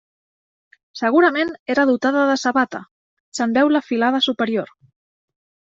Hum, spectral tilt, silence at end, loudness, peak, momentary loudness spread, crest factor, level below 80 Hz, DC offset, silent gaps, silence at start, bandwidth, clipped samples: none; -4 dB/octave; 1.1 s; -18 LUFS; -4 dBFS; 11 LU; 16 dB; -66 dBFS; under 0.1%; 1.60-1.66 s, 2.91-3.32 s; 0.95 s; 7.8 kHz; under 0.1%